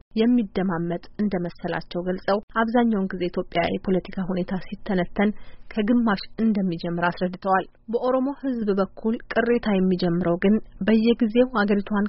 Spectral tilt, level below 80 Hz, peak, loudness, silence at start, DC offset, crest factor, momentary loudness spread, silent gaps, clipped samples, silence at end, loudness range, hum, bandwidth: -5.5 dB/octave; -46 dBFS; -6 dBFS; -24 LUFS; 0.15 s; under 0.1%; 16 dB; 8 LU; 2.43-2.48 s; under 0.1%; 0 s; 3 LU; none; 5.8 kHz